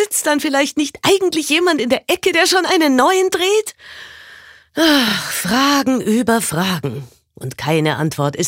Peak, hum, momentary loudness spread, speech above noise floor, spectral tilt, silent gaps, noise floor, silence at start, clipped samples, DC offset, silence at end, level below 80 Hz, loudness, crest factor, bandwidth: -2 dBFS; none; 16 LU; 26 dB; -3.5 dB/octave; none; -42 dBFS; 0 s; under 0.1%; under 0.1%; 0 s; -56 dBFS; -15 LUFS; 14 dB; 16 kHz